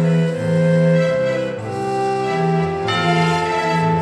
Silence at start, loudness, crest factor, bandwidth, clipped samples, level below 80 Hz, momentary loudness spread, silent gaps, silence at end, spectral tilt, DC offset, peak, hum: 0 s; -18 LUFS; 12 dB; 10.5 kHz; under 0.1%; -52 dBFS; 6 LU; none; 0 s; -6.5 dB/octave; under 0.1%; -6 dBFS; none